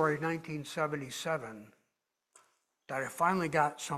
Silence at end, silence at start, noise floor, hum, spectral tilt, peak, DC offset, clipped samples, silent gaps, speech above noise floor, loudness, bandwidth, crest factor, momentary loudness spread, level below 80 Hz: 0 s; 0 s; -84 dBFS; none; -5 dB/octave; -14 dBFS; under 0.1%; under 0.1%; none; 51 dB; -34 LUFS; 16 kHz; 20 dB; 10 LU; -74 dBFS